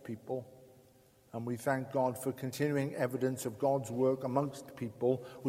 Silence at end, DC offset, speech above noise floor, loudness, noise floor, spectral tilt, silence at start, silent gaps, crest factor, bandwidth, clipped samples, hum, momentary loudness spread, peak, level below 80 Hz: 0 s; under 0.1%; 30 dB; -35 LUFS; -64 dBFS; -6.5 dB/octave; 0 s; none; 18 dB; 16.5 kHz; under 0.1%; none; 10 LU; -16 dBFS; -74 dBFS